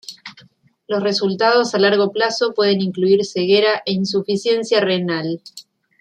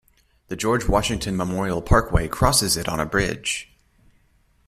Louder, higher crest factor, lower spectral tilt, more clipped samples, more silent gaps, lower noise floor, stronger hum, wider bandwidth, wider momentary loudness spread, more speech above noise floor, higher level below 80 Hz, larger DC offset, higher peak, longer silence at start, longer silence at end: first, -17 LUFS vs -22 LUFS; about the same, 16 dB vs 20 dB; about the same, -5 dB/octave vs -4 dB/octave; neither; neither; second, -52 dBFS vs -61 dBFS; neither; second, 9.6 kHz vs 15.5 kHz; about the same, 9 LU vs 8 LU; second, 35 dB vs 39 dB; second, -66 dBFS vs -32 dBFS; neither; about the same, -2 dBFS vs -4 dBFS; second, 0.1 s vs 0.5 s; second, 0.4 s vs 1.05 s